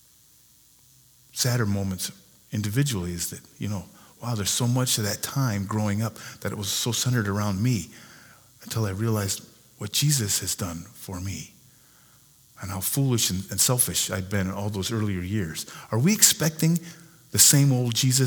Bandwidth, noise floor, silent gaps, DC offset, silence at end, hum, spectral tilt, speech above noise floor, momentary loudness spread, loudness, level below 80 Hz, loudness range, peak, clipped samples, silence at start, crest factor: over 20 kHz; -57 dBFS; none; under 0.1%; 0 s; none; -3.5 dB/octave; 32 dB; 16 LU; -24 LUFS; -58 dBFS; 6 LU; 0 dBFS; under 0.1%; 1.35 s; 26 dB